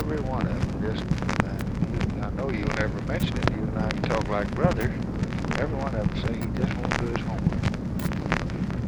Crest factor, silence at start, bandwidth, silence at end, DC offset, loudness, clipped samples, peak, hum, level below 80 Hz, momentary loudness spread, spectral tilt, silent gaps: 26 dB; 0 s; over 20 kHz; 0 s; under 0.1%; -27 LUFS; under 0.1%; -2 dBFS; none; -36 dBFS; 3 LU; -7 dB/octave; none